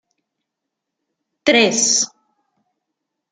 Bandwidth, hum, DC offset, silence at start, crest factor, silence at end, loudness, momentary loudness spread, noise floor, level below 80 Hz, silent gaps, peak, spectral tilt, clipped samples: 11 kHz; none; under 0.1%; 1.45 s; 22 dB; 1.25 s; -15 LUFS; 9 LU; -80 dBFS; -66 dBFS; none; 0 dBFS; -1 dB/octave; under 0.1%